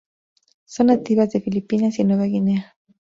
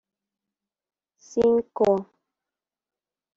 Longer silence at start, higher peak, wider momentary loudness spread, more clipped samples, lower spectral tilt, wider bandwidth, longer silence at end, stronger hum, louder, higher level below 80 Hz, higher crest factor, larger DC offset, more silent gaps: second, 0.7 s vs 1.3 s; first, -4 dBFS vs -8 dBFS; about the same, 6 LU vs 6 LU; neither; about the same, -8 dB/octave vs -7 dB/octave; about the same, 7.6 kHz vs 7.6 kHz; second, 0.4 s vs 1.35 s; neither; first, -20 LUFS vs -23 LUFS; about the same, -60 dBFS vs -62 dBFS; about the same, 16 dB vs 20 dB; neither; neither